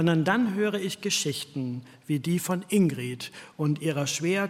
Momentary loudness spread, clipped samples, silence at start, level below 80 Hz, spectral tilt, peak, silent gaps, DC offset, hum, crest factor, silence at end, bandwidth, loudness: 11 LU; under 0.1%; 0 s; -70 dBFS; -5 dB/octave; -10 dBFS; none; under 0.1%; none; 18 dB; 0 s; 16.5 kHz; -27 LUFS